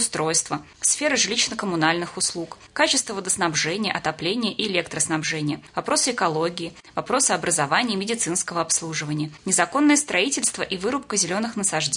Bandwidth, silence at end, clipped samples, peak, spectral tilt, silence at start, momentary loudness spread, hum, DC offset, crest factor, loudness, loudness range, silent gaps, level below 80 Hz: 11 kHz; 0 s; under 0.1%; -4 dBFS; -2.5 dB/octave; 0 s; 8 LU; none; under 0.1%; 20 dB; -22 LUFS; 2 LU; none; -60 dBFS